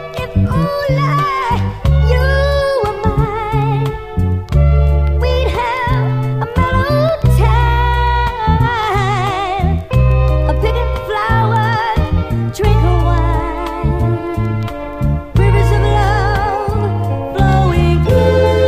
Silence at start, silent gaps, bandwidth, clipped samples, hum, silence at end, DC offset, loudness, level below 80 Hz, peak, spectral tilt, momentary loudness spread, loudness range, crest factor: 0 s; none; 15 kHz; under 0.1%; none; 0 s; under 0.1%; -14 LUFS; -18 dBFS; 0 dBFS; -7.5 dB/octave; 6 LU; 2 LU; 12 dB